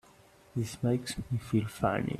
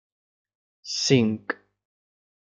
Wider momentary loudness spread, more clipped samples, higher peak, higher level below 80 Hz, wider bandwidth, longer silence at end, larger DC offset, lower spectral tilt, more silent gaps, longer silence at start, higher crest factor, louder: second, 6 LU vs 14 LU; neither; second, -12 dBFS vs -6 dBFS; first, -56 dBFS vs -70 dBFS; first, 14 kHz vs 9.4 kHz; second, 0 s vs 1 s; neither; first, -6.5 dB/octave vs -4.5 dB/octave; neither; second, 0.55 s vs 0.85 s; about the same, 20 dB vs 22 dB; second, -33 LUFS vs -24 LUFS